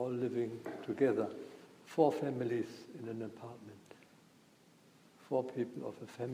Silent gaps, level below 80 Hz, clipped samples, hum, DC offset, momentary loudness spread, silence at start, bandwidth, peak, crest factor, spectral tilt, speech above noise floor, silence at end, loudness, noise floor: none; -84 dBFS; under 0.1%; none; under 0.1%; 19 LU; 0 s; 15.5 kHz; -16 dBFS; 22 dB; -7.5 dB/octave; 28 dB; 0 s; -37 LUFS; -65 dBFS